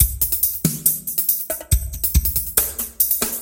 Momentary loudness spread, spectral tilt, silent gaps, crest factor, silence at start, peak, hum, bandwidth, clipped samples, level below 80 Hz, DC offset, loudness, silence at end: 4 LU; -3.5 dB/octave; none; 20 dB; 0 s; 0 dBFS; none; 17.5 kHz; under 0.1%; -28 dBFS; under 0.1%; -18 LUFS; 0 s